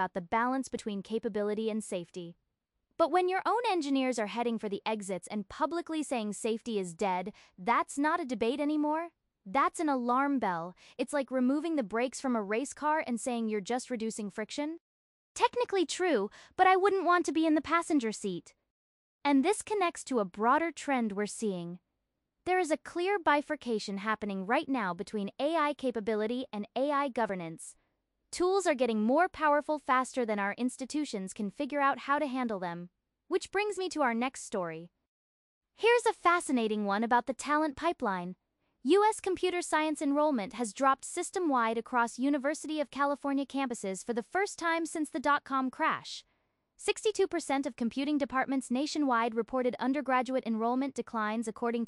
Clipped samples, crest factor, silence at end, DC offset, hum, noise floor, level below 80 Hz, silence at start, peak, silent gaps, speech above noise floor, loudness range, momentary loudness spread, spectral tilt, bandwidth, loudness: under 0.1%; 20 dB; 0 s; under 0.1%; none; -84 dBFS; -70 dBFS; 0 s; -12 dBFS; 14.80-15.35 s, 18.70-19.21 s, 35.08-35.61 s; 53 dB; 4 LU; 9 LU; -4 dB/octave; 12 kHz; -31 LUFS